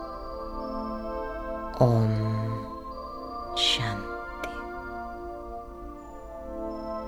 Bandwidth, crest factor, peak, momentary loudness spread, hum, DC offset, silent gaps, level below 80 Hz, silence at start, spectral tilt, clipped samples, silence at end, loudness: 14 kHz; 24 dB; -6 dBFS; 17 LU; none; under 0.1%; none; -44 dBFS; 0 s; -5.5 dB/octave; under 0.1%; 0 s; -30 LUFS